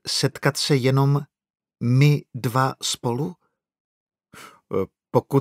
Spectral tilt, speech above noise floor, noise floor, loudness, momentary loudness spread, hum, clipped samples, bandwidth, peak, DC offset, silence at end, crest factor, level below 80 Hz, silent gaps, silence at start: -5.5 dB/octave; 26 dB; -47 dBFS; -22 LUFS; 10 LU; none; under 0.1%; 15.5 kHz; -4 dBFS; under 0.1%; 0 s; 20 dB; -64 dBFS; 3.80-4.06 s; 0.05 s